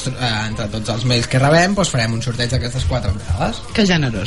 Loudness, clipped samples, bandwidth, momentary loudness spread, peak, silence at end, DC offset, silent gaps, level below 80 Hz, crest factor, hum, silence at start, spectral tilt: -18 LUFS; under 0.1%; 11.5 kHz; 8 LU; -2 dBFS; 0 s; 2%; none; -32 dBFS; 16 dB; none; 0 s; -5 dB/octave